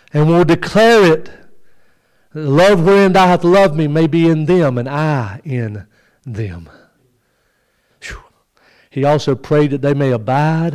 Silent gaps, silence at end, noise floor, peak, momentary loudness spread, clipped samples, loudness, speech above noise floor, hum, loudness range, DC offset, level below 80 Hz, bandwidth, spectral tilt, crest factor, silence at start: none; 0 s; -61 dBFS; -4 dBFS; 19 LU; under 0.1%; -13 LUFS; 49 dB; none; 16 LU; under 0.1%; -46 dBFS; 15 kHz; -7 dB/octave; 10 dB; 0.15 s